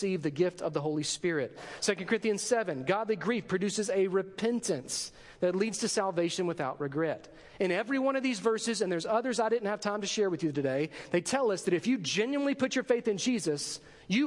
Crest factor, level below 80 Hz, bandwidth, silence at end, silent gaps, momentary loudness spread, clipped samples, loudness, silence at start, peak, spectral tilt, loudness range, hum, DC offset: 18 dB; -70 dBFS; 11.5 kHz; 0 s; none; 5 LU; under 0.1%; -31 LUFS; 0 s; -12 dBFS; -4 dB/octave; 1 LU; none; under 0.1%